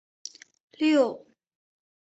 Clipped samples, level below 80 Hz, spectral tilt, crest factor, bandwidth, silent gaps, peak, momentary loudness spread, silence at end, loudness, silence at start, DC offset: under 0.1%; -78 dBFS; -3.5 dB/octave; 20 dB; 8.2 kHz; none; -10 dBFS; 21 LU; 1 s; -24 LUFS; 0.8 s; under 0.1%